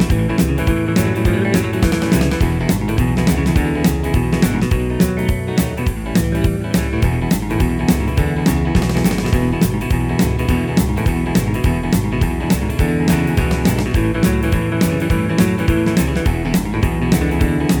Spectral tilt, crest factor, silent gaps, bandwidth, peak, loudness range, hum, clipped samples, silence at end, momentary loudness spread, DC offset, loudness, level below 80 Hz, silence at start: -6.5 dB/octave; 14 dB; none; over 20 kHz; 0 dBFS; 1 LU; none; under 0.1%; 0 s; 3 LU; under 0.1%; -17 LUFS; -22 dBFS; 0 s